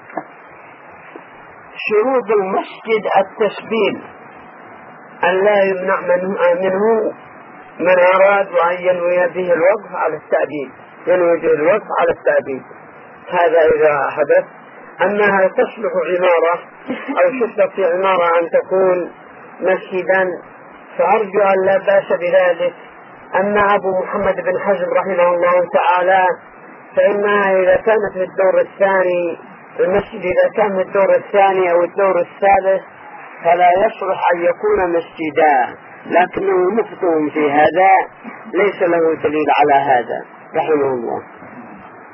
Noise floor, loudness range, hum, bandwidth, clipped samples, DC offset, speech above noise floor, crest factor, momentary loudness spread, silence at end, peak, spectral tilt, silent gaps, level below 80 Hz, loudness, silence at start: -39 dBFS; 3 LU; none; 5.6 kHz; under 0.1%; under 0.1%; 24 dB; 16 dB; 11 LU; 0.1 s; 0 dBFS; -3.5 dB/octave; none; -54 dBFS; -15 LUFS; 0.1 s